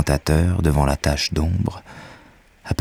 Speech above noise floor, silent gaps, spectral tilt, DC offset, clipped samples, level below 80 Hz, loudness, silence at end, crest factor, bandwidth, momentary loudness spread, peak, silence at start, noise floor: 30 dB; none; -5.5 dB/octave; under 0.1%; under 0.1%; -28 dBFS; -20 LUFS; 0.05 s; 18 dB; 15.5 kHz; 22 LU; -4 dBFS; 0 s; -50 dBFS